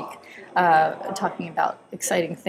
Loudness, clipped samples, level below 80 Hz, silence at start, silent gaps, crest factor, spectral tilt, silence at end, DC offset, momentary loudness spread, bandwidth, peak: -23 LUFS; under 0.1%; -72 dBFS; 0 s; none; 16 dB; -3.5 dB/octave; 0 s; under 0.1%; 11 LU; 16 kHz; -8 dBFS